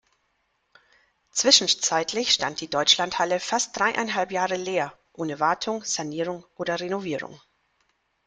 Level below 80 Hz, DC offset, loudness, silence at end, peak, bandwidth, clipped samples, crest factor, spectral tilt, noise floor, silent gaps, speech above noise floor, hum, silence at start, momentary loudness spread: -66 dBFS; under 0.1%; -24 LUFS; 0.9 s; -4 dBFS; 10.5 kHz; under 0.1%; 24 dB; -1.5 dB/octave; -72 dBFS; none; 47 dB; none; 1.35 s; 14 LU